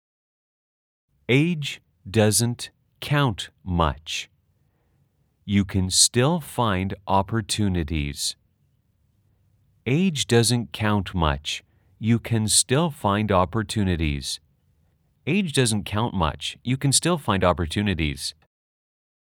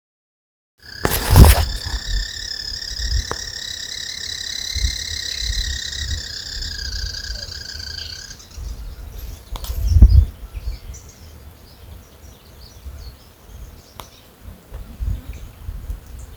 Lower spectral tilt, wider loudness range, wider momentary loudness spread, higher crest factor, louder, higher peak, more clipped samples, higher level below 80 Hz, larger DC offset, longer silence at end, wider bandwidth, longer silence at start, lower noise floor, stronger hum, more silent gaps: about the same, -4 dB/octave vs -4 dB/octave; second, 4 LU vs 21 LU; second, 12 LU vs 26 LU; about the same, 22 dB vs 22 dB; about the same, -23 LUFS vs -21 LUFS; second, -4 dBFS vs 0 dBFS; second, under 0.1% vs 0.1%; second, -44 dBFS vs -24 dBFS; neither; first, 1 s vs 0 s; about the same, 19 kHz vs over 20 kHz; first, 1.3 s vs 0.85 s; first, -66 dBFS vs -43 dBFS; neither; neither